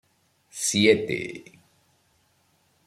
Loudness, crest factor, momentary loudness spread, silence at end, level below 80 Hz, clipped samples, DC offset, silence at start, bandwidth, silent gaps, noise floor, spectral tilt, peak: -23 LUFS; 24 dB; 22 LU; 1.45 s; -66 dBFS; under 0.1%; under 0.1%; 0.55 s; 15 kHz; none; -66 dBFS; -3.5 dB/octave; -4 dBFS